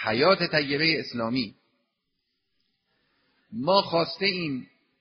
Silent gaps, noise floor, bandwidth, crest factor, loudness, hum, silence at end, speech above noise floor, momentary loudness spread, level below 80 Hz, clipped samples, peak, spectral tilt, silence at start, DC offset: none; -78 dBFS; 6.2 kHz; 22 dB; -24 LUFS; none; 0.35 s; 53 dB; 12 LU; -66 dBFS; under 0.1%; -6 dBFS; -2.5 dB/octave; 0 s; under 0.1%